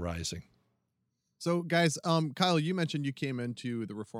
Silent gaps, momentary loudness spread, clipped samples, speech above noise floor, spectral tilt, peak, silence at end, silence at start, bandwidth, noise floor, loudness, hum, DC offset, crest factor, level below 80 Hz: none; 10 LU; under 0.1%; 50 dB; -5 dB/octave; -10 dBFS; 0 s; 0 s; 15.5 kHz; -81 dBFS; -31 LUFS; none; under 0.1%; 22 dB; -58 dBFS